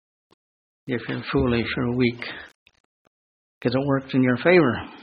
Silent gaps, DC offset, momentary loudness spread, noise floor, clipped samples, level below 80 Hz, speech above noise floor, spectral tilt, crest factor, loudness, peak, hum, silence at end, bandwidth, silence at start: 2.55-2.66 s, 2.80-3.61 s; under 0.1%; 16 LU; under -90 dBFS; under 0.1%; -48 dBFS; over 68 dB; -9 dB/octave; 20 dB; -22 LUFS; -4 dBFS; none; 0 s; 5.2 kHz; 0.85 s